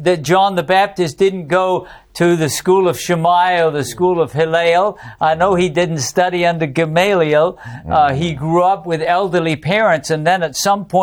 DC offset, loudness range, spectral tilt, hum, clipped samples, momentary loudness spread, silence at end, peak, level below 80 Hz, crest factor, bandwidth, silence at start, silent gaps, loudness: under 0.1%; 1 LU; -5 dB/octave; none; under 0.1%; 5 LU; 0 s; -2 dBFS; -48 dBFS; 12 dB; 19 kHz; 0 s; none; -15 LUFS